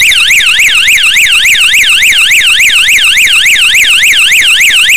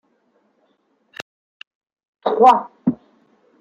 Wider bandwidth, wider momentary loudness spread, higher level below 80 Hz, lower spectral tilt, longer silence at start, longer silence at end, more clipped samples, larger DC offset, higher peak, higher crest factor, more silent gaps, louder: first, 16 kHz vs 8.8 kHz; second, 1 LU vs 25 LU; first, -36 dBFS vs -66 dBFS; second, 3 dB/octave vs -6.5 dB/octave; second, 0 s vs 2.25 s; second, 0 s vs 0.65 s; neither; first, 4% vs under 0.1%; about the same, 0 dBFS vs -2 dBFS; second, 6 dB vs 20 dB; neither; first, -2 LUFS vs -17 LUFS